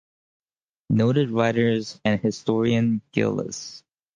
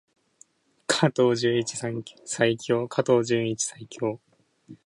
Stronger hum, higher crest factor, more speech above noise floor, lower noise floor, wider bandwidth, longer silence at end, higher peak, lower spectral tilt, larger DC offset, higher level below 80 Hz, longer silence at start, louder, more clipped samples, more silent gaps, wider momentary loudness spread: neither; about the same, 18 dB vs 20 dB; first, 46 dB vs 35 dB; first, -68 dBFS vs -59 dBFS; second, 9.2 kHz vs 11.5 kHz; first, 0.4 s vs 0.1 s; about the same, -6 dBFS vs -6 dBFS; first, -6.5 dB/octave vs -4.5 dB/octave; neither; first, -58 dBFS vs -68 dBFS; about the same, 0.9 s vs 0.9 s; about the same, -23 LUFS vs -25 LUFS; neither; neither; second, 8 LU vs 12 LU